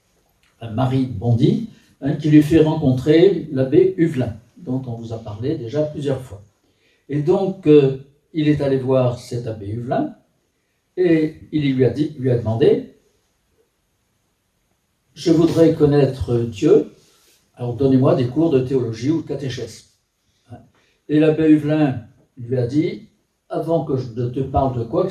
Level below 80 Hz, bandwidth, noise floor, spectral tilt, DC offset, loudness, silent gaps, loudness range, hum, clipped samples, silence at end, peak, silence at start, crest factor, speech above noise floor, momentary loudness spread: -48 dBFS; 11.5 kHz; -67 dBFS; -8.5 dB/octave; under 0.1%; -18 LUFS; none; 6 LU; none; under 0.1%; 0 s; 0 dBFS; 0.6 s; 18 dB; 50 dB; 15 LU